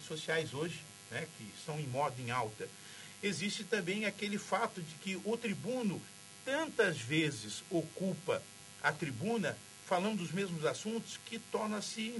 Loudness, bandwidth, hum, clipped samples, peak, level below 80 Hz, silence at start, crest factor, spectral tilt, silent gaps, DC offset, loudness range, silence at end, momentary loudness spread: -37 LUFS; 11.5 kHz; none; under 0.1%; -16 dBFS; -76 dBFS; 0 s; 20 dB; -4.5 dB/octave; none; under 0.1%; 3 LU; 0 s; 11 LU